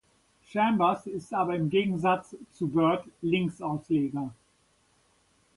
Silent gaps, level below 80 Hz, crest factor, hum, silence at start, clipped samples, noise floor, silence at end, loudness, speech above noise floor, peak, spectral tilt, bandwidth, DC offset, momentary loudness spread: none; -66 dBFS; 18 dB; none; 0.5 s; under 0.1%; -67 dBFS; 1.25 s; -28 LUFS; 40 dB; -12 dBFS; -7.5 dB/octave; 11.5 kHz; under 0.1%; 10 LU